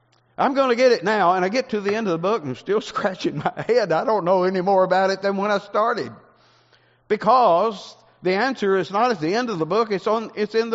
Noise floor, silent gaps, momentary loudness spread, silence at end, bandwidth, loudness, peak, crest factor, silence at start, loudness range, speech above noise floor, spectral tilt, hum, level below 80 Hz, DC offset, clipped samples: -58 dBFS; none; 8 LU; 0 s; 8 kHz; -21 LUFS; -4 dBFS; 16 dB; 0.4 s; 1 LU; 38 dB; -3.5 dB/octave; none; -68 dBFS; under 0.1%; under 0.1%